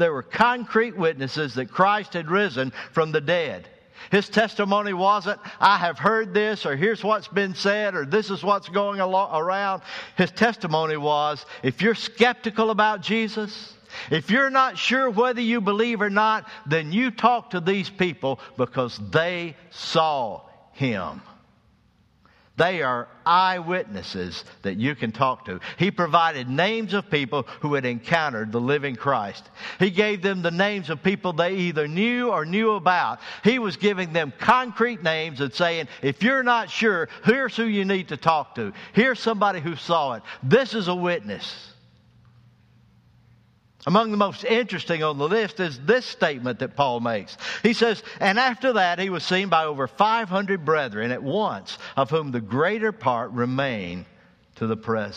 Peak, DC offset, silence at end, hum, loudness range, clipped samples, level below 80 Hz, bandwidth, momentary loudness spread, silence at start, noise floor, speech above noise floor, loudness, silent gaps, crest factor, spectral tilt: -2 dBFS; under 0.1%; 0 s; none; 4 LU; under 0.1%; -64 dBFS; 9.8 kHz; 9 LU; 0 s; -60 dBFS; 37 dB; -23 LUFS; none; 22 dB; -5.5 dB/octave